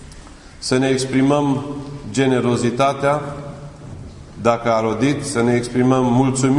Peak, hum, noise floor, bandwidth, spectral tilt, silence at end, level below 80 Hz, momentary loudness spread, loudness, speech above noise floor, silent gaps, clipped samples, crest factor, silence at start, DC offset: -2 dBFS; none; -39 dBFS; 11 kHz; -6 dB/octave; 0 s; -44 dBFS; 18 LU; -18 LUFS; 22 dB; none; under 0.1%; 16 dB; 0 s; under 0.1%